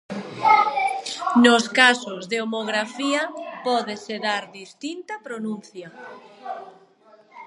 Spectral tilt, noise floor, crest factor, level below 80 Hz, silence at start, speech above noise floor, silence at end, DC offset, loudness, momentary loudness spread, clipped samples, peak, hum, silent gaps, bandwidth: -3 dB/octave; -54 dBFS; 22 dB; -76 dBFS; 0.1 s; 30 dB; 0 s; under 0.1%; -21 LUFS; 22 LU; under 0.1%; 0 dBFS; none; none; 11.5 kHz